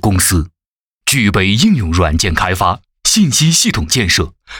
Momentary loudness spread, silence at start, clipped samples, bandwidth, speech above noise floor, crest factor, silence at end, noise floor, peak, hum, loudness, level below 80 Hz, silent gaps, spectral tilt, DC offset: 6 LU; 0.05 s; under 0.1%; 19.5 kHz; 72 dB; 12 dB; 0 s; -84 dBFS; 0 dBFS; none; -12 LUFS; -28 dBFS; 0.66-1.01 s; -3.5 dB/octave; under 0.1%